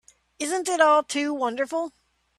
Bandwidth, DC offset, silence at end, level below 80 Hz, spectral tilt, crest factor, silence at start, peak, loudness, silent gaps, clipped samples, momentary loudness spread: 13 kHz; under 0.1%; 0.5 s; -72 dBFS; -1.5 dB/octave; 20 dB; 0.4 s; -4 dBFS; -24 LUFS; none; under 0.1%; 12 LU